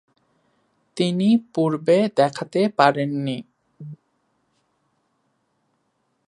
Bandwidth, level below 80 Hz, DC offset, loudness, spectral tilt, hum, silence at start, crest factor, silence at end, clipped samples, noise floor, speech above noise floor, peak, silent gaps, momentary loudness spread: 11 kHz; -74 dBFS; under 0.1%; -20 LUFS; -6.5 dB/octave; none; 0.95 s; 24 dB; 2.35 s; under 0.1%; -71 dBFS; 51 dB; 0 dBFS; none; 23 LU